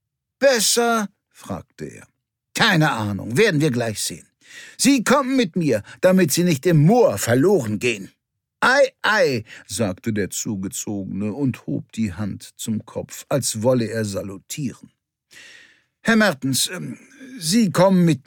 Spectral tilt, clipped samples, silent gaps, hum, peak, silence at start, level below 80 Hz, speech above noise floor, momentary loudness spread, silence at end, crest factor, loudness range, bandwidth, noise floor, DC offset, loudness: -4.5 dB/octave; under 0.1%; none; none; -2 dBFS; 0.4 s; -60 dBFS; 32 dB; 16 LU; 0.05 s; 18 dB; 8 LU; 19 kHz; -51 dBFS; under 0.1%; -20 LUFS